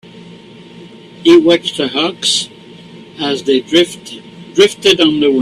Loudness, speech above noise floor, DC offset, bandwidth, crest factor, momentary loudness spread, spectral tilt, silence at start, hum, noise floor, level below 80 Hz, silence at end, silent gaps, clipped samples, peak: -12 LUFS; 24 dB; under 0.1%; 13 kHz; 14 dB; 14 LU; -3.5 dB/octave; 0.15 s; none; -36 dBFS; -54 dBFS; 0 s; none; under 0.1%; 0 dBFS